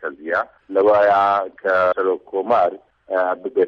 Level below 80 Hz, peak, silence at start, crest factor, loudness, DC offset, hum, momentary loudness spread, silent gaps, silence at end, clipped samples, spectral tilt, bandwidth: -64 dBFS; -6 dBFS; 0 s; 12 dB; -19 LUFS; under 0.1%; none; 9 LU; none; 0 s; under 0.1%; -6.5 dB/octave; 6.6 kHz